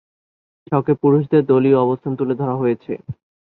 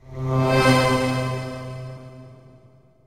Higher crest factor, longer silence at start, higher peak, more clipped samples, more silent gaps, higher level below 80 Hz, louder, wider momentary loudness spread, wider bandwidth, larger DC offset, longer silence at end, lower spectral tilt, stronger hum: about the same, 16 dB vs 18 dB; first, 0.7 s vs 0.05 s; about the same, -2 dBFS vs -4 dBFS; neither; neither; second, -58 dBFS vs -44 dBFS; about the same, -18 LUFS vs -20 LUFS; second, 15 LU vs 21 LU; second, 4.2 kHz vs 15.5 kHz; neither; second, 0.4 s vs 0.7 s; first, -12 dB/octave vs -6 dB/octave; neither